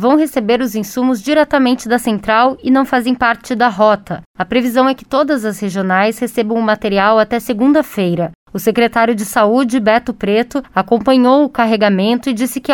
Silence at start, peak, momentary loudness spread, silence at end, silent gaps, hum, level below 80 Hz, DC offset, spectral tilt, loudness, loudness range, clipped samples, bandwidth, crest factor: 0 s; 0 dBFS; 6 LU; 0 s; 4.26-4.34 s, 8.35-8.46 s; none; -46 dBFS; under 0.1%; -5.5 dB/octave; -14 LUFS; 2 LU; under 0.1%; 18.5 kHz; 14 dB